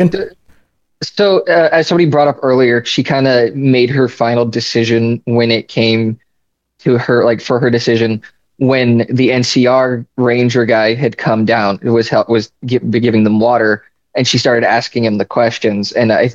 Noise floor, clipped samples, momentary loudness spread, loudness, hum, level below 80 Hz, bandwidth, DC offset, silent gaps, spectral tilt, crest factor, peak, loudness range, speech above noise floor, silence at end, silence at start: -68 dBFS; under 0.1%; 5 LU; -12 LUFS; none; -54 dBFS; 8 kHz; 0.1%; none; -6 dB/octave; 12 dB; 0 dBFS; 2 LU; 56 dB; 0 s; 0 s